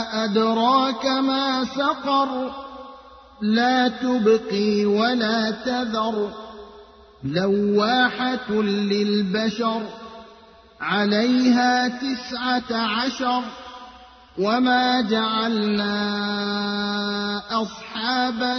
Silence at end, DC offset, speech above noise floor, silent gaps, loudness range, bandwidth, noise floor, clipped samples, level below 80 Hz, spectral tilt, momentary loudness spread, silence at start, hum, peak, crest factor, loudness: 0 s; under 0.1%; 27 dB; none; 2 LU; 6.6 kHz; -49 dBFS; under 0.1%; -58 dBFS; -5 dB/octave; 13 LU; 0 s; none; -6 dBFS; 16 dB; -21 LUFS